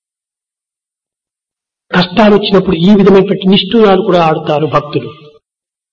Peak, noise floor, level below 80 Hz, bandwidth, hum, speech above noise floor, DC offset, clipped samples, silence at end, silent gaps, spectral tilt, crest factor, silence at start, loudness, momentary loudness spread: 0 dBFS; -86 dBFS; -40 dBFS; 7 kHz; none; 78 dB; under 0.1%; under 0.1%; 0.8 s; none; -7.5 dB/octave; 10 dB; 1.9 s; -9 LUFS; 8 LU